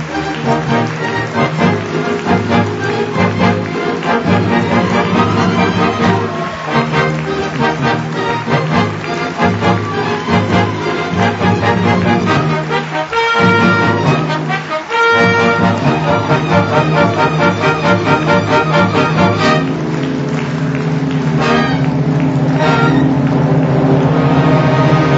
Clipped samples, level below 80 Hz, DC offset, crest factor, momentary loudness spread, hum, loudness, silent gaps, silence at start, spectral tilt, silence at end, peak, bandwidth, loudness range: under 0.1%; -42 dBFS; under 0.1%; 12 dB; 6 LU; none; -13 LUFS; none; 0 s; -6.5 dB/octave; 0 s; 0 dBFS; 8 kHz; 3 LU